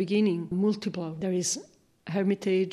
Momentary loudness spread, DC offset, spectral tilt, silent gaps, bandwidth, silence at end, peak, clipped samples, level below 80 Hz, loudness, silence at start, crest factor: 8 LU; under 0.1%; -5 dB/octave; none; 14 kHz; 0 s; -14 dBFS; under 0.1%; -66 dBFS; -28 LUFS; 0 s; 14 dB